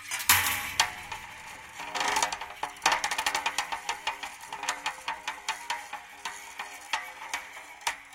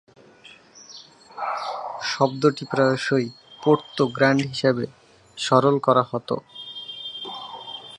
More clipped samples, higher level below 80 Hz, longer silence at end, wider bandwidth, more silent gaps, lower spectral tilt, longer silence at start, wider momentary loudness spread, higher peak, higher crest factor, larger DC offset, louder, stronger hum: neither; first, -62 dBFS vs -68 dBFS; about the same, 0 s vs 0 s; first, 17 kHz vs 11 kHz; neither; second, 0.5 dB/octave vs -5.5 dB/octave; second, 0 s vs 0.45 s; about the same, 14 LU vs 16 LU; about the same, -4 dBFS vs -2 dBFS; first, 28 dB vs 22 dB; neither; second, -30 LUFS vs -23 LUFS; neither